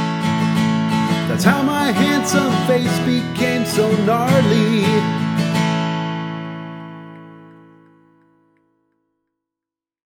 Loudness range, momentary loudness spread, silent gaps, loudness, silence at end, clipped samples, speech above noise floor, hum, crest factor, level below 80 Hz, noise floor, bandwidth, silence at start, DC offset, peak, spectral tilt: 13 LU; 13 LU; none; -17 LUFS; 2.65 s; under 0.1%; 72 dB; none; 18 dB; -58 dBFS; -87 dBFS; 18.5 kHz; 0 s; under 0.1%; 0 dBFS; -5.5 dB/octave